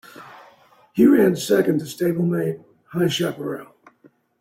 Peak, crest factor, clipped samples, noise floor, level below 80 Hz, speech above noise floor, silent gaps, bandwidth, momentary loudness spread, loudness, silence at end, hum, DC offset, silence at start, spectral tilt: -4 dBFS; 18 dB; under 0.1%; -56 dBFS; -64 dBFS; 37 dB; none; 16.5 kHz; 19 LU; -20 LUFS; 0.75 s; none; under 0.1%; 0.2 s; -6 dB/octave